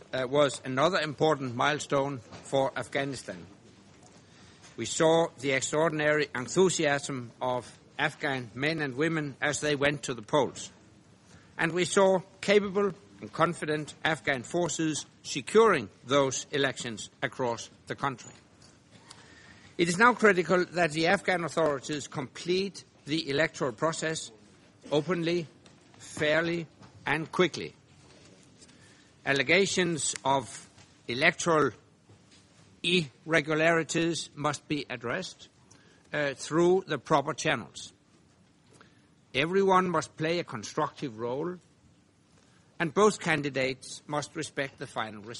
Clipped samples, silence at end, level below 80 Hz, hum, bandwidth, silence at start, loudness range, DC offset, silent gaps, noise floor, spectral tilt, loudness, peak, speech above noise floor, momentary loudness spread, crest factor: under 0.1%; 0 s; -66 dBFS; none; 11.5 kHz; 0.15 s; 4 LU; under 0.1%; none; -62 dBFS; -4 dB/octave; -28 LUFS; -6 dBFS; 34 dB; 13 LU; 24 dB